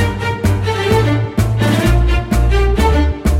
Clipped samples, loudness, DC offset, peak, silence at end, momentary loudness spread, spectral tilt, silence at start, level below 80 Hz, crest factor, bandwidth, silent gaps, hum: under 0.1%; -15 LUFS; under 0.1%; -2 dBFS; 0 s; 3 LU; -6.5 dB/octave; 0 s; -16 dBFS; 10 dB; 16 kHz; none; none